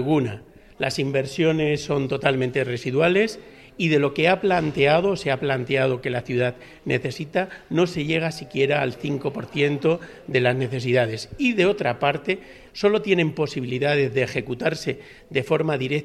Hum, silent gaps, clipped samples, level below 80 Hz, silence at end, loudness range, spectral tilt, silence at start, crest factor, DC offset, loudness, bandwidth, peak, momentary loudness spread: none; none; under 0.1%; -54 dBFS; 0 s; 3 LU; -6 dB/octave; 0 s; 20 dB; under 0.1%; -23 LUFS; 13 kHz; -2 dBFS; 8 LU